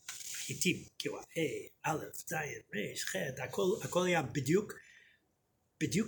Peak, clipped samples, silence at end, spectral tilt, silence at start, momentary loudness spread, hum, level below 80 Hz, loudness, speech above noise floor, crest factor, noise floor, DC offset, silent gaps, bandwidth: -16 dBFS; under 0.1%; 0 s; -4 dB/octave; 0.05 s; 8 LU; none; -70 dBFS; -36 LUFS; 42 dB; 20 dB; -78 dBFS; under 0.1%; none; over 20 kHz